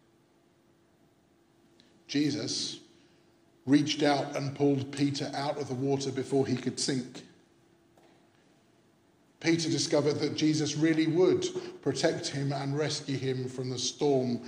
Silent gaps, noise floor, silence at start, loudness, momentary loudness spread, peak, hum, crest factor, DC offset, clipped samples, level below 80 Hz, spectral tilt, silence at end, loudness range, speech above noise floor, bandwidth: none; -65 dBFS; 2.1 s; -30 LUFS; 8 LU; -12 dBFS; none; 20 dB; under 0.1%; under 0.1%; -76 dBFS; -5 dB/octave; 0 s; 7 LU; 36 dB; 10.5 kHz